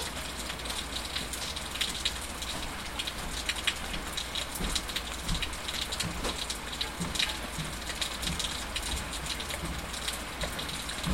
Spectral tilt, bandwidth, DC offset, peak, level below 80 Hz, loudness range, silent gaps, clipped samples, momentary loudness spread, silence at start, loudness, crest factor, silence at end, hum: -2 dB/octave; 16.5 kHz; 0.2%; -12 dBFS; -42 dBFS; 1 LU; none; under 0.1%; 5 LU; 0 s; -33 LUFS; 24 dB; 0 s; none